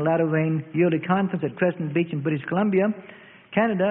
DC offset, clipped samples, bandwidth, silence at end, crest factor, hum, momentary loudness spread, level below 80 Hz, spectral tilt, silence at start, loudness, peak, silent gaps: under 0.1%; under 0.1%; 3.9 kHz; 0 s; 16 dB; none; 5 LU; -66 dBFS; -12 dB/octave; 0 s; -24 LUFS; -6 dBFS; none